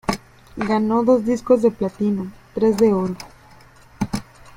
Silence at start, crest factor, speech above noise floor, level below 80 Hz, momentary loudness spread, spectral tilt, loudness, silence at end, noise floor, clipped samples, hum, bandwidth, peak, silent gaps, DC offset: 0.1 s; 18 dB; 29 dB; -46 dBFS; 14 LU; -7 dB/octave; -20 LUFS; 0.35 s; -47 dBFS; under 0.1%; none; 16.5 kHz; -4 dBFS; none; under 0.1%